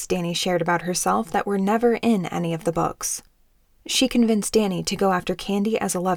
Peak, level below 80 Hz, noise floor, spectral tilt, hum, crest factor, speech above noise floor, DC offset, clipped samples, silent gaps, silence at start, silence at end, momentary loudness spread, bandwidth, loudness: -8 dBFS; -50 dBFS; -59 dBFS; -4 dB/octave; none; 14 dB; 37 dB; under 0.1%; under 0.1%; none; 0 s; 0 s; 6 LU; 19 kHz; -22 LUFS